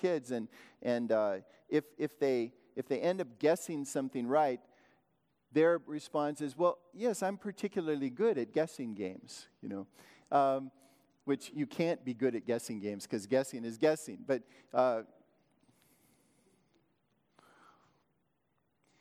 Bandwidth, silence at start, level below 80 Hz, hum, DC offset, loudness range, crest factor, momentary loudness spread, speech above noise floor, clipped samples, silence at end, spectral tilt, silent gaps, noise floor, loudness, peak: 16 kHz; 0 s; -88 dBFS; none; under 0.1%; 3 LU; 20 dB; 11 LU; 45 dB; under 0.1%; 3.95 s; -5.5 dB/octave; none; -79 dBFS; -35 LUFS; -16 dBFS